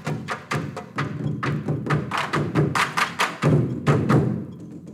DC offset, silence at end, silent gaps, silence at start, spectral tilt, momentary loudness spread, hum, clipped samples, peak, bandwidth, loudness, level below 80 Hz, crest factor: under 0.1%; 0 s; none; 0 s; -6 dB/octave; 10 LU; none; under 0.1%; -8 dBFS; 14 kHz; -23 LUFS; -52 dBFS; 16 dB